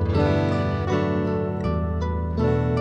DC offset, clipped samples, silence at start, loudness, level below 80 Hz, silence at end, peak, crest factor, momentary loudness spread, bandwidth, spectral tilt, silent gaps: under 0.1%; under 0.1%; 0 s; -23 LUFS; -34 dBFS; 0 s; -8 dBFS; 14 dB; 5 LU; 7.6 kHz; -8.5 dB/octave; none